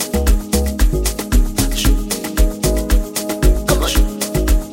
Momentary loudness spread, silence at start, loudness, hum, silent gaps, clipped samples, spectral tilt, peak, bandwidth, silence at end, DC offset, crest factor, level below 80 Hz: 3 LU; 0 s; -18 LUFS; none; none; under 0.1%; -4.5 dB/octave; -2 dBFS; 17 kHz; 0 s; under 0.1%; 14 dB; -16 dBFS